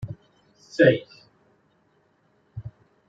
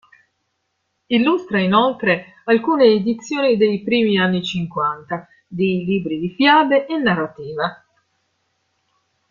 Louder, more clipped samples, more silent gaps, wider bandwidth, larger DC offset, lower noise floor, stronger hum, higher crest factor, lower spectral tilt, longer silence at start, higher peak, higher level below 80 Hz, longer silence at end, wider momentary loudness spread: second, -21 LUFS vs -18 LUFS; neither; neither; about the same, 7.8 kHz vs 7.4 kHz; neither; second, -65 dBFS vs -72 dBFS; neither; first, 24 dB vs 18 dB; about the same, -7 dB/octave vs -6.5 dB/octave; second, 0 s vs 1.1 s; about the same, -4 dBFS vs -2 dBFS; about the same, -60 dBFS vs -60 dBFS; second, 0.4 s vs 1.55 s; first, 25 LU vs 11 LU